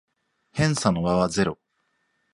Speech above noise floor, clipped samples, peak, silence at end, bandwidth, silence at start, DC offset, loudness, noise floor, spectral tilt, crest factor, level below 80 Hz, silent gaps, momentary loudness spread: 50 dB; under 0.1%; -4 dBFS; 0.8 s; 11.5 kHz; 0.55 s; under 0.1%; -23 LUFS; -72 dBFS; -5.5 dB/octave; 22 dB; -50 dBFS; none; 11 LU